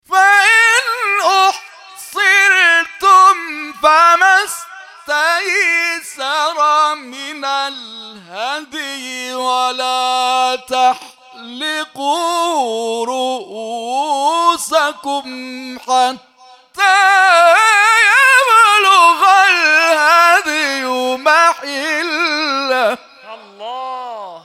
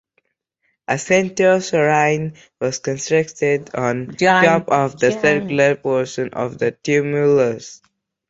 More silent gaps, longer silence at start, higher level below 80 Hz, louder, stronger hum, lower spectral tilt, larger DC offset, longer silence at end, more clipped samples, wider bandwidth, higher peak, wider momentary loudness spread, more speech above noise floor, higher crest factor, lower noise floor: neither; second, 0.1 s vs 0.9 s; second, -66 dBFS vs -58 dBFS; first, -12 LUFS vs -17 LUFS; neither; second, 0.5 dB/octave vs -5 dB/octave; neither; second, 0.05 s vs 0.55 s; neither; first, 16.5 kHz vs 8 kHz; about the same, 0 dBFS vs 0 dBFS; first, 17 LU vs 9 LU; second, 28 dB vs 53 dB; about the same, 14 dB vs 18 dB; second, -44 dBFS vs -70 dBFS